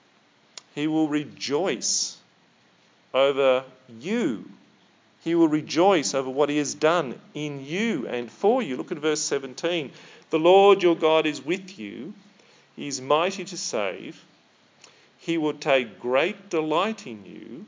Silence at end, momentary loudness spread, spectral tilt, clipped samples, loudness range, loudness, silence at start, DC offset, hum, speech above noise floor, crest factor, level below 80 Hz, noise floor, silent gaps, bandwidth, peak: 0 s; 17 LU; -3.5 dB/octave; under 0.1%; 7 LU; -24 LUFS; 0.75 s; under 0.1%; none; 36 dB; 20 dB; -84 dBFS; -60 dBFS; none; 7.8 kHz; -6 dBFS